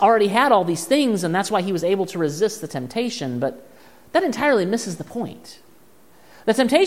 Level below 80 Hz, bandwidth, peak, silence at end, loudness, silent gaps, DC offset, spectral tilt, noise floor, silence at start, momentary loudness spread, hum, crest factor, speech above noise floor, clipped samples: -64 dBFS; 16 kHz; -2 dBFS; 0 s; -21 LUFS; none; 0.3%; -4.5 dB/octave; -53 dBFS; 0 s; 13 LU; none; 18 dB; 33 dB; under 0.1%